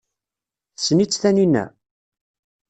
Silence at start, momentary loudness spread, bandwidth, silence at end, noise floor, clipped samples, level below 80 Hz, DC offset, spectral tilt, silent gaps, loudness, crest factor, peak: 0.8 s; 8 LU; 9 kHz; 1 s; -88 dBFS; under 0.1%; -62 dBFS; under 0.1%; -5 dB/octave; none; -18 LUFS; 18 dB; -4 dBFS